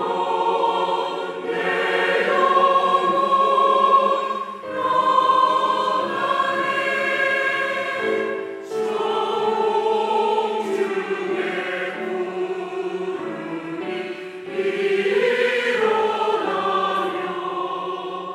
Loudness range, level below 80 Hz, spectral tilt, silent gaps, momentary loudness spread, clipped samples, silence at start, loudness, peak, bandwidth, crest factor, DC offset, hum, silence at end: 7 LU; -78 dBFS; -4 dB/octave; none; 11 LU; under 0.1%; 0 s; -21 LUFS; -4 dBFS; 13.5 kHz; 16 dB; under 0.1%; none; 0 s